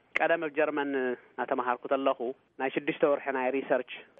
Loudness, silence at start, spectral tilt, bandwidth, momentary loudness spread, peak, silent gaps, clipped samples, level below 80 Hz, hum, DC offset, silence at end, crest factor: -30 LUFS; 0.15 s; -2.5 dB/octave; 6.2 kHz; 7 LU; -12 dBFS; none; under 0.1%; -80 dBFS; none; under 0.1%; 0.15 s; 18 dB